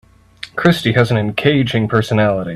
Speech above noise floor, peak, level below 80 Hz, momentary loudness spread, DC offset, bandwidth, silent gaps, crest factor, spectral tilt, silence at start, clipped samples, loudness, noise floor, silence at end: 23 dB; 0 dBFS; -46 dBFS; 2 LU; under 0.1%; 13.5 kHz; none; 16 dB; -6.5 dB/octave; 0.45 s; under 0.1%; -15 LUFS; -37 dBFS; 0 s